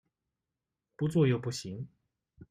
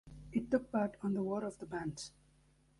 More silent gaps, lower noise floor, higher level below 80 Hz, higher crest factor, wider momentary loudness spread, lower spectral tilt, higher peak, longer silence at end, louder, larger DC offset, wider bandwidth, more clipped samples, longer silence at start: neither; first, -89 dBFS vs -69 dBFS; about the same, -66 dBFS vs -64 dBFS; about the same, 20 dB vs 20 dB; first, 17 LU vs 9 LU; about the same, -6.5 dB/octave vs -6.5 dB/octave; first, -14 dBFS vs -20 dBFS; second, 0.05 s vs 0.7 s; first, -31 LUFS vs -38 LUFS; neither; about the same, 12.5 kHz vs 11.5 kHz; neither; first, 1 s vs 0.05 s